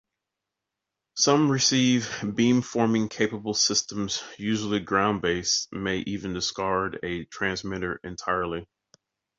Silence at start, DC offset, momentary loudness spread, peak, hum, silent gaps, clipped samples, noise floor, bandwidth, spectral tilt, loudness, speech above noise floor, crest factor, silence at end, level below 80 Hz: 1.15 s; under 0.1%; 11 LU; -6 dBFS; none; none; under 0.1%; -86 dBFS; 7.8 kHz; -3.5 dB/octave; -25 LUFS; 60 dB; 20 dB; 0.75 s; -54 dBFS